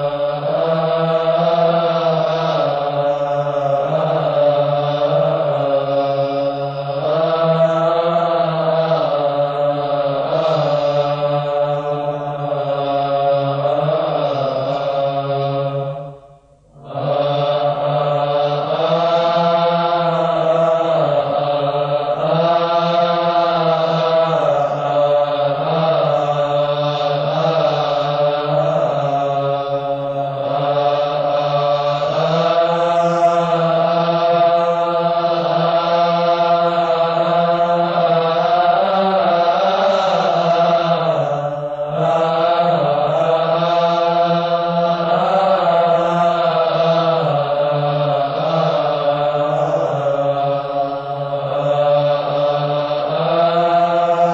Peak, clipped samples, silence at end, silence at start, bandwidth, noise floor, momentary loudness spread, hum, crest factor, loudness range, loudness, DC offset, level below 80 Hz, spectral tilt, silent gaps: -4 dBFS; under 0.1%; 0 s; 0 s; 7.6 kHz; -47 dBFS; 5 LU; none; 12 dB; 3 LU; -16 LUFS; under 0.1%; -56 dBFS; -7 dB/octave; none